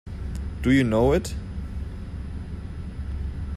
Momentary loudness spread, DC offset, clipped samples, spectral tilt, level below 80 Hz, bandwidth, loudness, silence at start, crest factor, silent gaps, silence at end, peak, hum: 15 LU; under 0.1%; under 0.1%; -7 dB/octave; -34 dBFS; 14 kHz; -27 LUFS; 0.05 s; 16 dB; none; 0 s; -8 dBFS; none